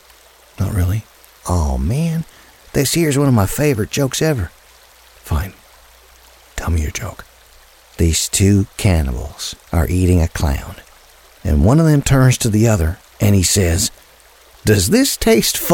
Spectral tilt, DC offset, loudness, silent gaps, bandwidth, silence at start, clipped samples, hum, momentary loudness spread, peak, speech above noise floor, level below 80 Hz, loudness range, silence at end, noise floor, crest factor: -5 dB/octave; under 0.1%; -16 LUFS; none; 19 kHz; 0.6 s; under 0.1%; none; 13 LU; 0 dBFS; 32 dB; -28 dBFS; 8 LU; 0 s; -47 dBFS; 16 dB